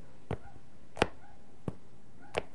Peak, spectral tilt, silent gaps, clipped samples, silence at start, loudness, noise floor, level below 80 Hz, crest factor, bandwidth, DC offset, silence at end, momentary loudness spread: -6 dBFS; -5 dB/octave; none; under 0.1%; 0 s; -38 LUFS; -58 dBFS; -56 dBFS; 34 dB; 11.5 kHz; 1%; 0.1 s; 24 LU